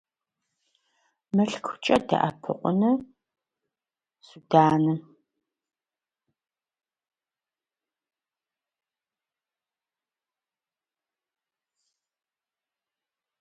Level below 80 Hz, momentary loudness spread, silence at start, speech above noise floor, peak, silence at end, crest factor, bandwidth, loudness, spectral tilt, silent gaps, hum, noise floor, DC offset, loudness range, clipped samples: -68 dBFS; 9 LU; 1.35 s; over 66 dB; -4 dBFS; 8.4 s; 26 dB; 11 kHz; -24 LUFS; -7 dB/octave; none; none; under -90 dBFS; under 0.1%; 2 LU; under 0.1%